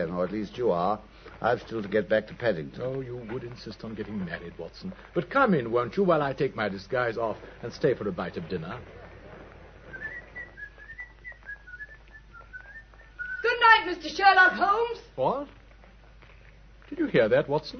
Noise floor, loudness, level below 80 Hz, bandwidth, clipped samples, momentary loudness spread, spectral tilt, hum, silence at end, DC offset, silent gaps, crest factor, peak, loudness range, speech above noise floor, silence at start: -52 dBFS; -26 LUFS; -54 dBFS; 6.6 kHz; under 0.1%; 23 LU; -6 dB/octave; none; 0 s; under 0.1%; none; 22 dB; -6 dBFS; 18 LU; 25 dB; 0 s